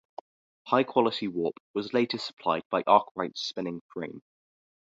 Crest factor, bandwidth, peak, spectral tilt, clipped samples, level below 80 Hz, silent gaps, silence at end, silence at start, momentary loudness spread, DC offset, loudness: 24 dB; 7.8 kHz; -6 dBFS; -5.5 dB/octave; under 0.1%; -74 dBFS; 1.60-1.74 s, 2.33-2.37 s, 2.65-2.70 s, 3.11-3.15 s, 3.81-3.89 s; 0.75 s; 0.65 s; 15 LU; under 0.1%; -28 LUFS